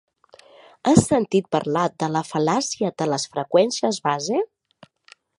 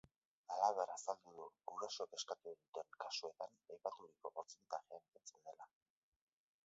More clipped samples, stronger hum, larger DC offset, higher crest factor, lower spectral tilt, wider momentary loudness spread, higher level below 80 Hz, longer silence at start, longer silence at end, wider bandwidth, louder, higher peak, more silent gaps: neither; neither; neither; about the same, 22 dB vs 26 dB; first, -5 dB/octave vs 0.5 dB/octave; second, 7 LU vs 19 LU; first, -54 dBFS vs under -90 dBFS; first, 0.85 s vs 0.5 s; about the same, 0.95 s vs 1 s; first, 11.5 kHz vs 7.6 kHz; first, -21 LUFS vs -47 LUFS; first, 0 dBFS vs -22 dBFS; second, none vs 2.68-2.73 s, 5.08-5.12 s